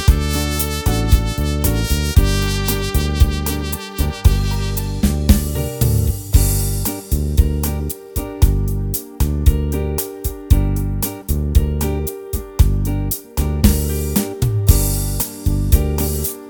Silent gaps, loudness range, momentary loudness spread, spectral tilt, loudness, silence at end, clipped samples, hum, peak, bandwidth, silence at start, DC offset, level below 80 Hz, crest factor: none; 2 LU; 6 LU; -5.5 dB/octave; -18 LUFS; 0 s; under 0.1%; none; 0 dBFS; 19.5 kHz; 0 s; under 0.1%; -20 dBFS; 16 dB